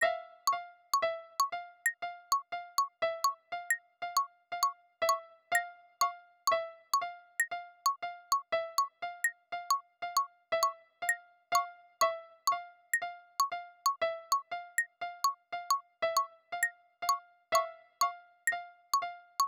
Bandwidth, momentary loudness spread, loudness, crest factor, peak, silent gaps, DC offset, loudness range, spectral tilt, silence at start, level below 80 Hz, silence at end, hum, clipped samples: 19.5 kHz; 5 LU; -34 LUFS; 18 dB; -16 dBFS; none; under 0.1%; 1 LU; 1.5 dB/octave; 0 s; -84 dBFS; 0 s; none; under 0.1%